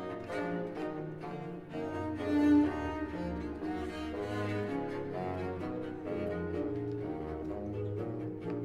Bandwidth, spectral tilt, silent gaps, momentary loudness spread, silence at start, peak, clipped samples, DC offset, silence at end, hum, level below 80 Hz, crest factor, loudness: 9.8 kHz; -8 dB/octave; none; 9 LU; 0 s; -16 dBFS; under 0.1%; under 0.1%; 0 s; none; -54 dBFS; 18 dB; -36 LUFS